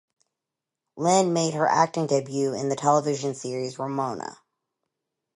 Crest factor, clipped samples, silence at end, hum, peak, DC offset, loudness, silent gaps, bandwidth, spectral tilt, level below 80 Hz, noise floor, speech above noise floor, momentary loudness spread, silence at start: 20 dB; under 0.1%; 1.05 s; none; -6 dBFS; under 0.1%; -24 LUFS; none; 11.5 kHz; -5 dB/octave; -74 dBFS; -87 dBFS; 63 dB; 10 LU; 0.95 s